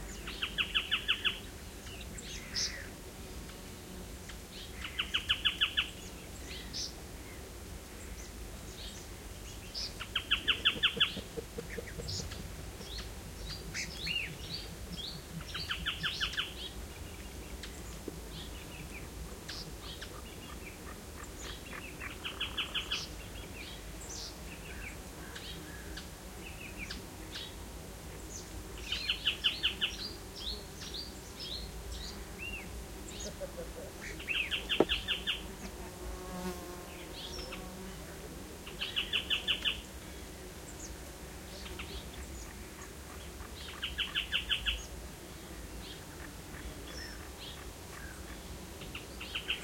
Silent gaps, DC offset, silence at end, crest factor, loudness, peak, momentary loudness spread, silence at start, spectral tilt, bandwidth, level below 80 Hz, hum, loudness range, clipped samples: none; under 0.1%; 0 s; 30 dB; -38 LUFS; -10 dBFS; 15 LU; 0 s; -2.5 dB/octave; 16.5 kHz; -50 dBFS; none; 10 LU; under 0.1%